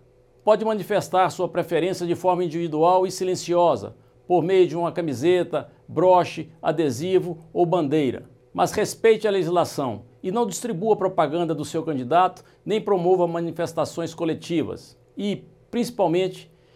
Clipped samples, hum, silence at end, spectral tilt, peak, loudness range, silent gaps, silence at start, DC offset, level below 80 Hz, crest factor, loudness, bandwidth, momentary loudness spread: under 0.1%; none; 0.3 s; -6 dB/octave; -4 dBFS; 4 LU; none; 0.45 s; under 0.1%; -62 dBFS; 18 dB; -23 LUFS; 15 kHz; 10 LU